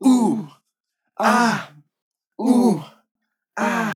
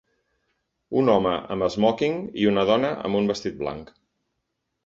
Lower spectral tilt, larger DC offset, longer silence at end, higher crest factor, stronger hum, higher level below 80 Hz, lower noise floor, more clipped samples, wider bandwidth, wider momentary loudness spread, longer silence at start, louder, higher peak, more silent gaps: second, -5 dB/octave vs -6.5 dB/octave; neither; second, 0 s vs 1 s; about the same, 18 dB vs 20 dB; neither; second, under -90 dBFS vs -56 dBFS; about the same, -77 dBFS vs -78 dBFS; neither; first, 15 kHz vs 7.8 kHz; first, 21 LU vs 10 LU; second, 0 s vs 0.9 s; first, -20 LUFS vs -23 LUFS; about the same, -4 dBFS vs -6 dBFS; first, 2.02-2.11 s, 3.11-3.15 s vs none